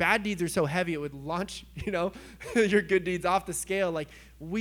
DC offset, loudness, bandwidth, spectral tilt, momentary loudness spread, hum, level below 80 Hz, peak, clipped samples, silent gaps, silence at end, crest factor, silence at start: under 0.1%; -29 LUFS; over 20 kHz; -4.5 dB/octave; 12 LU; none; -54 dBFS; -8 dBFS; under 0.1%; none; 0 s; 20 dB; 0 s